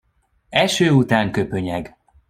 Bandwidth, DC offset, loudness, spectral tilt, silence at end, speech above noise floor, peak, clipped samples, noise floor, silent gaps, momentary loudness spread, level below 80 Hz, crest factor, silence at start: 15.5 kHz; under 0.1%; -19 LUFS; -5.5 dB/octave; 0.4 s; 45 dB; -2 dBFS; under 0.1%; -63 dBFS; none; 12 LU; -50 dBFS; 18 dB; 0.5 s